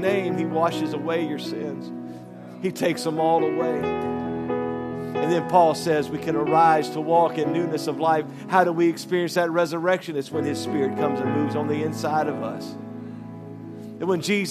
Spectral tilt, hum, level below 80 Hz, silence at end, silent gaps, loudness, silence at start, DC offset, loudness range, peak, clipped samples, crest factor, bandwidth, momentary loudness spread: -6 dB/octave; none; -66 dBFS; 0 s; none; -23 LUFS; 0 s; under 0.1%; 5 LU; -4 dBFS; under 0.1%; 20 dB; 14.5 kHz; 16 LU